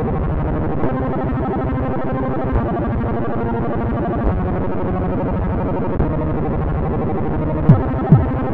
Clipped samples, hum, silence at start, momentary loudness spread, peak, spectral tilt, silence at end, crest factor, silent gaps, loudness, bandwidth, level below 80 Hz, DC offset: under 0.1%; none; 0 s; 7 LU; 0 dBFS; -12 dB/octave; 0 s; 18 dB; none; -19 LUFS; 4.3 kHz; -26 dBFS; 3%